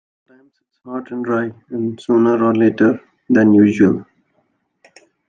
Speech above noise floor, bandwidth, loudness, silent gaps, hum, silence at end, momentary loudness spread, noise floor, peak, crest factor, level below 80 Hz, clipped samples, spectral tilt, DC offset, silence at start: 49 dB; 7.4 kHz; -16 LUFS; none; none; 1.25 s; 15 LU; -65 dBFS; -2 dBFS; 14 dB; -62 dBFS; under 0.1%; -8.5 dB/octave; under 0.1%; 0.85 s